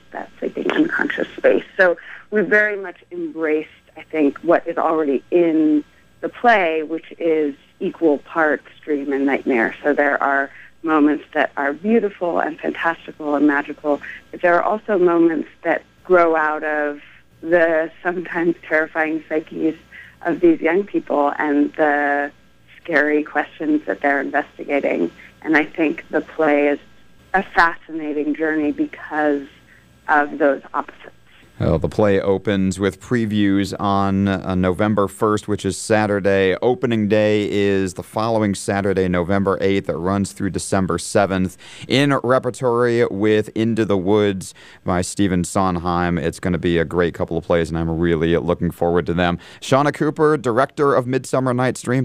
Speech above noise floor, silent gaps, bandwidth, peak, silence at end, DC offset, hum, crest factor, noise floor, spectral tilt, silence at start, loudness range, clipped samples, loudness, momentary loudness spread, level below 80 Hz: 31 dB; none; 15 kHz; -2 dBFS; 0 s; under 0.1%; none; 18 dB; -50 dBFS; -6 dB/octave; 0.1 s; 2 LU; under 0.1%; -19 LUFS; 8 LU; -48 dBFS